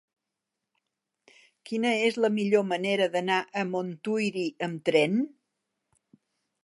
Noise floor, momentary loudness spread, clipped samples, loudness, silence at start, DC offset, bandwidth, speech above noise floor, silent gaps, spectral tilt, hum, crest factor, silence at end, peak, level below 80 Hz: -86 dBFS; 7 LU; under 0.1%; -27 LUFS; 1.65 s; under 0.1%; 11.5 kHz; 59 dB; none; -5.5 dB/octave; none; 20 dB; 1.35 s; -10 dBFS; -80 dBFS